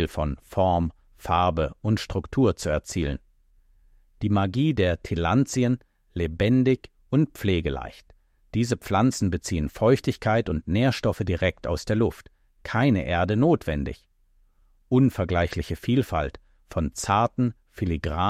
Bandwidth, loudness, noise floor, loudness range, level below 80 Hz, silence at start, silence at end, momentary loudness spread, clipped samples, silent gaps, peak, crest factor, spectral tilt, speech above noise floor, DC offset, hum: 15.5 kHz; -25 LUFS; -62 dBFS; 2 LU; -40 dBFS; 0 s; 0 s; 9 LU; under 0.1%; none; -8 dBFS; 18 dB; -6.5 dB/octave; 38 dB; under 0.1%; none